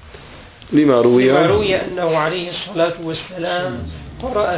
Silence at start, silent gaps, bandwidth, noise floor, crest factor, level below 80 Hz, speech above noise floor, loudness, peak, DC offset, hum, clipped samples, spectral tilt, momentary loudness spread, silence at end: 0 s; none; 4 kHz; -39 dBFS; 16 dB; -40 dBFS; 23 dB; -17 LUFS; -2 dBFS; under 0.1%; none; under 0.1%; -10.5 dB/octave; 14 LU; 0 s